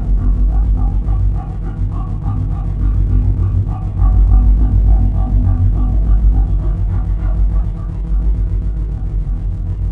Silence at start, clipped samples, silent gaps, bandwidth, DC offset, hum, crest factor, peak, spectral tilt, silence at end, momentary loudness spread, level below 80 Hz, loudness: 0 s; under 0.1%; none; 1.9 kHz; under 0.1%; none; 12 dB; 0 dBFS; -11 dB/octave; 0 s; 8 LU; -14 dBFS; -17 LUFS